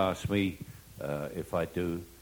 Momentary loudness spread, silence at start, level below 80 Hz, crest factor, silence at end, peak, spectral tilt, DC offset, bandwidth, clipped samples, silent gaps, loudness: 12 LU; 0 s; -54 dBFS; 18 dB; 0 s; -14 dBFS; -6 dB/octave; under 0.1%; over 20 kHz; under 0.1%; none; -34 LUFS